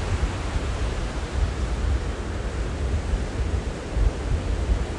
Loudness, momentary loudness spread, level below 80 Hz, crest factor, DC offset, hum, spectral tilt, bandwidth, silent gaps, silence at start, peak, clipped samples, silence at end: -28 LUFS; 3 LU; -26 dBFS; 16 dB; under 0.1%; none; -6 dB/octave; 11 kHz; none; 0 s; -8 dBFS; under 0.1%; 0 s